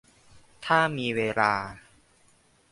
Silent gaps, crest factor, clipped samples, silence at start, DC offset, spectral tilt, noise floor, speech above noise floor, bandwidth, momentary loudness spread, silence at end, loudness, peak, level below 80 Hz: none; 24 dB; under 0.1%; 0.35 s; under 0.1%; -5 dB/octave; -62 dBFS; 37 dB; 11.5 kHz; 14 LU; 0.95 s; -25 LUFS; -6 dBFS; -62 dBFS